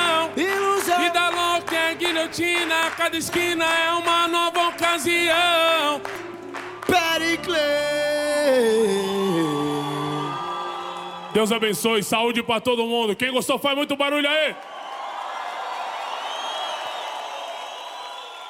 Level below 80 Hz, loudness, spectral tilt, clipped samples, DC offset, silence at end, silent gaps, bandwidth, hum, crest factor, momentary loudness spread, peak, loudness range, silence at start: -62 dBFS; -22 LUFS; -3 dB/octave; under 0.1%; under 0.1%; 0 s; none; 17 kHz; none; 16 dB; 13 LU; -8 dBFS; 6 LU; 0 s